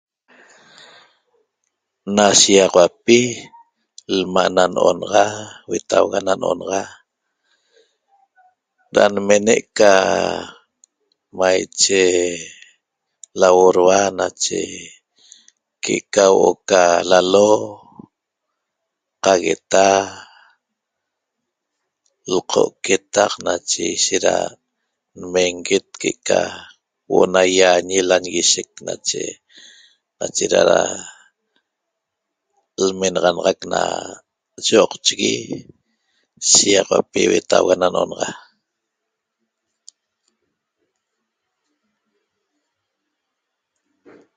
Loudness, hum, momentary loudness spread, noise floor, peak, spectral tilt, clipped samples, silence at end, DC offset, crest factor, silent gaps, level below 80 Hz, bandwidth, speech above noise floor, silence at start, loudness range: -16 LUFS; none; 16 LU; -79 dBFS; 0 dBFS; -2.5 dB/octave; under 0.1%; 6 s; under 0.1%; 18 dB; none; -56 dBFS; 9.6 kHz; 62 dB; 2.05 s; 6 LU